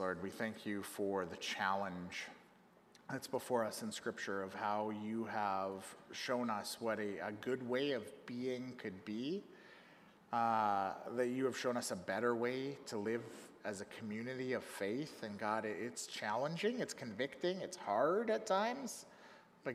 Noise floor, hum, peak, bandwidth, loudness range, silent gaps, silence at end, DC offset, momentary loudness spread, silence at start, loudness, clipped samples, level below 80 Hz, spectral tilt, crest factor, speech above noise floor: -66 dBFS; none; -22 dBFS; 15.5 kHz; 4 LU; none; 0 s; under 0.1%; 11 LU; 0 s; -40 LUFS; under 0.1%; -84 dBFS; -4.5 dB/octave; 18 dB; 26 dB